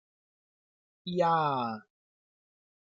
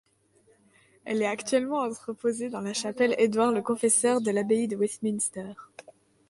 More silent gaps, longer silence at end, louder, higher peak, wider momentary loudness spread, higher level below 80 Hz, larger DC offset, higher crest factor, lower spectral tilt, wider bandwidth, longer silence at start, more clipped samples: neither; first, 1.1 s vs 0.5 s; about the same, -29 LUFS vs -27 LUFS; second, -16 dBFS vs -10 dBFS; first, 17 LU vs 10 LU; second, -80 dBFS vs -72 dBFS; neither; about the same, 18 dB vs 18 dB; first, -7 dB/octave vs -3.5 dB/octave; second, 7.4 kHz vs 11.5 kHz; about the same, 1.05 s vs 1.05 s; neither